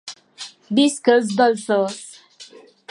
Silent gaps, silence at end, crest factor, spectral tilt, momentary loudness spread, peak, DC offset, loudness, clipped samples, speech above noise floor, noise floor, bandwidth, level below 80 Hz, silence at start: none; 0.45 s; 18 dB; -4 dB/octave; 20 LU; -2 dBFS; under 0.1%; -18 LUFS; under 0.1%; 28 dB; -45 dBFS; 11 kHz; -74 dBFS; 0.05 s